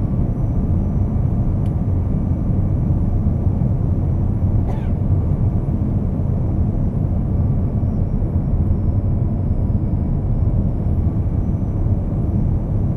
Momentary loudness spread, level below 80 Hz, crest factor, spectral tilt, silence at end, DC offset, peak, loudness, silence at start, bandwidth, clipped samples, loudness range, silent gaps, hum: 2 LU; -22 dBFS; 12 dB; -12 dB/octave; 0 s; under 0.1%; -6 dBFS; -20 LUFS; 0 s; 2.6 kHz; under 0.1%; 1 LU; none; none